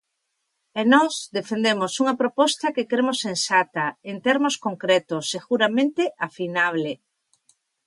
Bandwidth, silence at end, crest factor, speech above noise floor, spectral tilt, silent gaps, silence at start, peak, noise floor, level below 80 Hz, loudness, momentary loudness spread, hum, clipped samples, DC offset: 11.5 kHz; 0.9 s; 20 dB; 54 dB; -3.5 dB/octave; none; 0.75 s; -4 dBFS; -77 dBFS; -76 dBFS; -22 LUFS; 9 LU; none; under 0.1%; under 0.1%